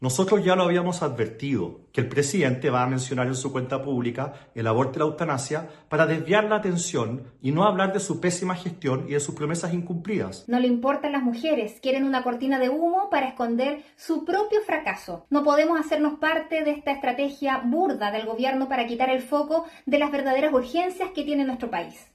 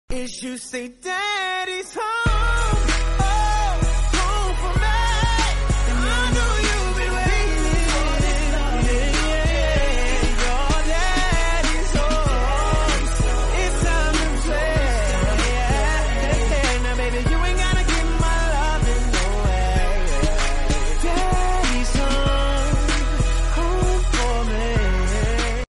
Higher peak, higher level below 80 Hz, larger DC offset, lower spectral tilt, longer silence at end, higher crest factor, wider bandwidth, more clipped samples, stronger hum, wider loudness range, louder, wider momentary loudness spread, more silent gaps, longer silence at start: about the same, -6 dBFS vs -8 dBFS; second, -62 dBFS vs -20 dBFS; neither; first, -5.5 dB/octave vs -4 dB/octave; about the same, 0.15 s vs 0.05 s; first, 18 dB vs 12 dB; first, 13 kHz vs 11.5 kHz; neither; neither; about the same, 2 LU vs 1 LU; second, -25 LUFS vs -21 LUFS; first, 8 LU vs 3 LU; neither; about the same, 0 s vs 0.1 s